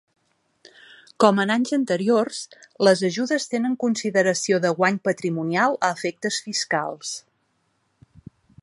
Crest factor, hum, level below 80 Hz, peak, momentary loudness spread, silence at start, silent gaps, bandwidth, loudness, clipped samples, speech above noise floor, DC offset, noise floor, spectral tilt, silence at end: 22 dB; none; -70 dBFS; 0 dBFS; 10 LU; 1.2 s; none; 11.5 kHz; -22 LUFS; under 0.1%; 48 dB; under 0.1%; -69 dBFS; -4 dB/octave; 1.45 s